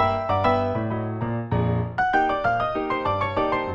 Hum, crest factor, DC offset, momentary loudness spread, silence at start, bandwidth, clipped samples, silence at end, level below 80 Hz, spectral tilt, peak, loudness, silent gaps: none; 16 dB; under 0.1%; 6 LU; 0 s; 7.2 kHz; under 0.1%; 0 s; -44 dBFS; -8 dB/octave; -8 dBFS; -23 LUFS; none